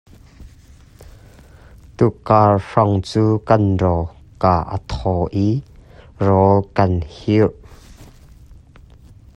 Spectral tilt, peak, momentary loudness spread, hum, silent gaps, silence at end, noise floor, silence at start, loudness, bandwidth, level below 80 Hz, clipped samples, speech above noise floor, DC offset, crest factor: -8.5 dB/octave; 0 dBFS; 9 LU; none; none; 0.85 s; -45 dBFS; 0.4 s; -17 LUFS; 9.2 kHz; -40 dBFS; under 0.1%; 29 dB; under 0.1%; 18 dB